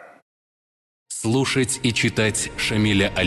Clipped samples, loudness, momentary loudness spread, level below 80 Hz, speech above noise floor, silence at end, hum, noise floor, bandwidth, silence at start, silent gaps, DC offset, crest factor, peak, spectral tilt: under 0.1%; -21 LUFS; 4 LU; -44 dBFS; over 69 dB; 0 s; none; under -90 dBFS; 12.5 kHz; 0 s; 0.22-1.06 s; under 0.1%; 16 dB; -8 dBFS; -4 dB/octave